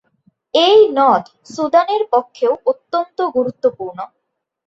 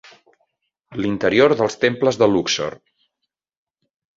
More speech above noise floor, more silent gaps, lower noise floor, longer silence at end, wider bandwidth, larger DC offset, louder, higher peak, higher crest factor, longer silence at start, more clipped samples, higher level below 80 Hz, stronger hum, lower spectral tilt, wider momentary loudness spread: second, 44 dB vs 61 dB; neither; second, -59 dBFS vs -79 dBFS; second, 0.6 s vs 1.4 s; about the same, 7.8 kHz vs 7.8 kHz; neither; first, -15 LUFS vs -18 LUFS; about the same, -2 dBFS vs -2 dBFS; second, 14 dB vs 20 dB; second, 0.55 s vs 0.9 s; neither; second, -64 dBFS vs -56 dBFS; neither; about the same, -4.5 dB/octave vs -4.5 dB/octave; first, 17 LU vs 11 LU